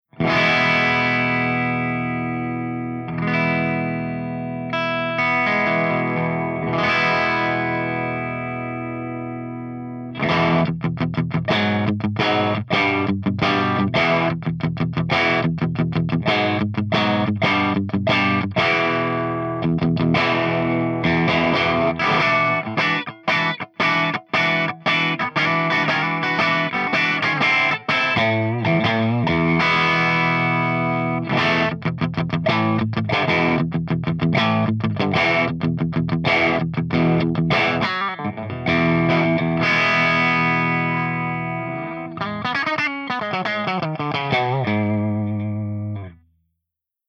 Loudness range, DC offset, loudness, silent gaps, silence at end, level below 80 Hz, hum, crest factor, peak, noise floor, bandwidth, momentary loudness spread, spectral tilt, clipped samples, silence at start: 4 LU; under 0.1%; -20 LUFS; none; 0.95 s; -54 dBFS; none; 16 dB; -6 dBFS; -82 dBFS; 7 kHz; 8 LU; -6.5 dB/octave; under 0.1%; 0.15 s